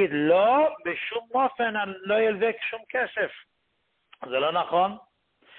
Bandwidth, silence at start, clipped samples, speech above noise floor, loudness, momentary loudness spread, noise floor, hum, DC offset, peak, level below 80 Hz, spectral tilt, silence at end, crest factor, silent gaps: 4.3 kHz; 0 s; under 0.1%; 49 dB; -25 LUFS; 10 LU; -74 dBFS; none; under 0.1%; -10 dBFS; -70 dBFS; -9 dB/octave; 0.6 s; 16 dB; none